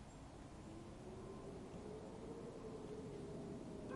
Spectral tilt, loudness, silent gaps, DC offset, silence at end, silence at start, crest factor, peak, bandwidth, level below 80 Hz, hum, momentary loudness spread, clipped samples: -6.5 dB/octave; -53 LUFS; none; under 0.1%; 0 s; 0 s; 16 dB; -36 dBFS; 11.5 kHz; -64 dBFS; none; 5 LU; under 0.1%